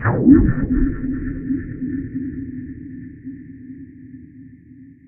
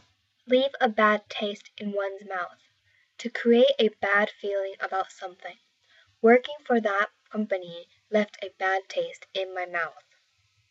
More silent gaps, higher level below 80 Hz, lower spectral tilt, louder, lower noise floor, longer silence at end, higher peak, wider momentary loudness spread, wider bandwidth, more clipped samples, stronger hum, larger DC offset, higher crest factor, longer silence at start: neither; first, -30 dBFS vs -84 dBFS; first, -12.5 dB/octave vs -5 dB/octave; first, -19 LUFS vs -26 LUFS; second, -44 dBFS vs -69 dBFS; second, 0.15 s vs 0.8 s; first, 0 dBFS vs -8 dBFS; first, 26 LU vs 16 LU; second, 2.6 kHz vs 8 kHz; neither; neither; neither; about the same, 20 dB vs 20 dB; second, 0 s vs 0.45 s